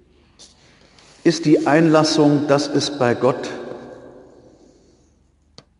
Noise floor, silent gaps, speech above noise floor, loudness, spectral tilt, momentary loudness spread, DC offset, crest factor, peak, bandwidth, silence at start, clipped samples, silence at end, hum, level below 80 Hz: -58 dBFS; none; 42 dB; -17 LUFS; -5.5 dB/octave; 18 LU; under 0.1%; 18 dB; -2 dBFS; 10.5 kHz; 1.25 s; under 0.1%; 1.7 s; none; -60 dBFS